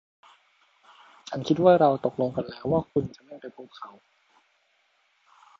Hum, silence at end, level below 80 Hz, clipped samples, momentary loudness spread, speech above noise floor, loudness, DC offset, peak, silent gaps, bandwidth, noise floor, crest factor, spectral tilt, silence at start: none; 1.7 s; -60 dBFS; under 0.1%; 25 LU; 43 dB; -24 LUFS; under 0.1%; -6 dBFS; none; 7.6 kHz; -68 dBFS; 22 dB; -7.5 dB/octave; 1.3 s